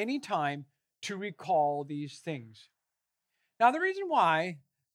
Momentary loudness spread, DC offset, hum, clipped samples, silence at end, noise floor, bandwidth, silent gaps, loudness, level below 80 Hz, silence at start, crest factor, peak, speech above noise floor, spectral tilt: 15 LU; under 0.1%; none; under 0.1%; 0.35 s; -86 dBFS; 12 kHz; none; -30 LUFS; under -90 dBFS; 0 s; 22 dB; -10 dBFS; 55 dB; -5 dB/octave